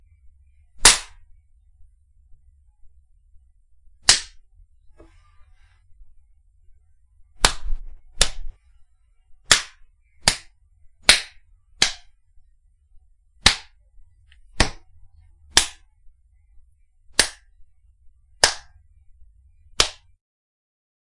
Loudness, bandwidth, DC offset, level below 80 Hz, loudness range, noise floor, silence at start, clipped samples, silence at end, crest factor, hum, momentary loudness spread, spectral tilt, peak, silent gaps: -19 LUFS; 12 kHz; under 0.1%; -38 dBFS; 6 LU; -57 dBFS; 0.8 s; under 0.1%; 1.25 s; 26 dB; none; 22 LU; 0 dB/octave; 0 dBFS; none